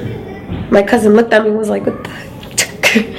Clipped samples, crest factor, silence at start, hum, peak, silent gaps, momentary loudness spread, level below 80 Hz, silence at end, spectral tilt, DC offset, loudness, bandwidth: 0.3%; 14 dB; 0 s; none; 0 dBFS; none; 16 LU; -40 dBFS; 0 s; -4 dB/octave; under 0.1%; -12 LUFS; 16.5 kHz